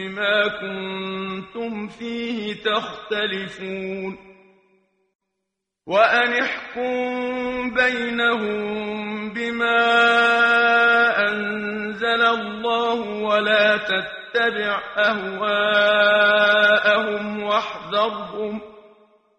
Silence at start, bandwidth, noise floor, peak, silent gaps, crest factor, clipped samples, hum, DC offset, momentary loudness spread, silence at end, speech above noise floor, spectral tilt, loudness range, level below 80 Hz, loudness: 0 s; 9.2 kHz; -80 dBFS; -2 dBFS; 5.15-5.19 s; 18 dB; under 0.1%; none; under 0.1%; 13 LU; 0.6 s; 60 dB; -4.5 dB/octave; 9 LU; -60 dBFS; -20 LUFS